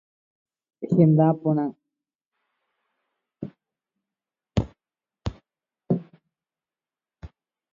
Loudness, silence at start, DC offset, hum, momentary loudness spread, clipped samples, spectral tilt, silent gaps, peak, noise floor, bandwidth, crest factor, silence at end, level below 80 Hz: -23 LUFS; 0.8 s; under 0.1%; none; 22 LU; under 0.1%; -10 dB/octave; 2.15-2.19 s, 2.27-2.31 s; -6 dBFS; under -90 dBFS; 7.2 kHz; 22 dB; 0.45 s; -48 dBFS